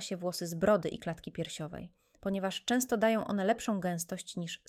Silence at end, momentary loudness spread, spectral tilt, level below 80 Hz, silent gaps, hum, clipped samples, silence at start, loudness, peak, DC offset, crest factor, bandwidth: 0.15 s; 12 LU; -4.5 dB/octave; -64 dBFS; none; none; under 0.1%; 0 s; -33 LUFS; -14 dBFS; under 0.1%; 18 dB; 19 kHz